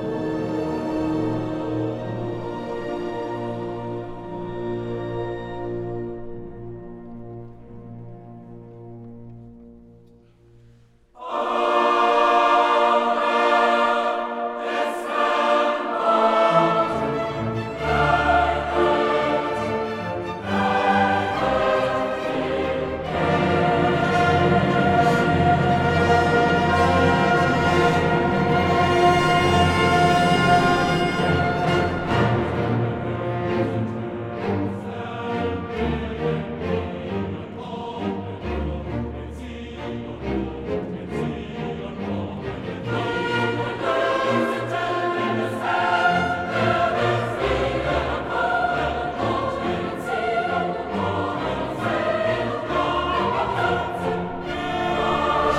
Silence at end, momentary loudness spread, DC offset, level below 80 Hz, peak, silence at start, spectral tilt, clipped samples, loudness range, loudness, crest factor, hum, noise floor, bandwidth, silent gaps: 0 s; 13 LU; under 0.1%; -42 dBFS; -4 dBFS; 0 s; -6.5 dB/octave; under 0.1%; 11 LU; -22 LUFS; 18 dB; none; -53 dBFS; 14 kHz; none